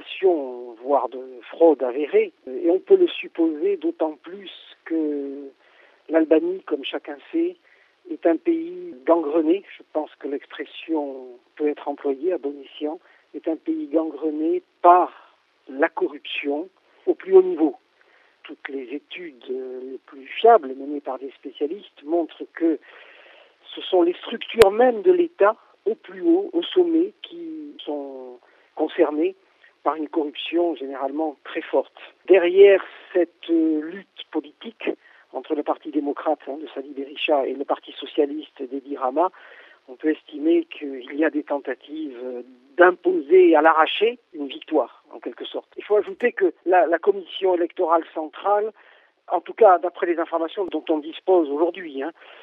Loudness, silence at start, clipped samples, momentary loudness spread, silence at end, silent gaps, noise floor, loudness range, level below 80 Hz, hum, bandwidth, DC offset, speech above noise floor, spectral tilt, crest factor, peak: -22 LUFS; 0 s; under 0.1%; 17 LU; 0.3 s; none; -58 dBFS; 7 LU; -64 dBFS; none; 12 kHz; under 0.1%; 36 dB; -5 dB/octave; 22 dB; 0 dBFS